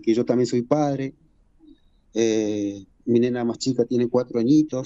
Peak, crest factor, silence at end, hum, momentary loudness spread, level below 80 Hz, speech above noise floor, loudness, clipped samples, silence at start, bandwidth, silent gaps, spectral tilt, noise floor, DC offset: -6 dBFS; 16 dB; 0 s; none; 10 LU; -60 dBFS; 32 dB; -22 LUFS; under 0.1%; 0 s; 8.2 kHz; none; -6.5 dB/octave; -53 dBFS; under 0.1%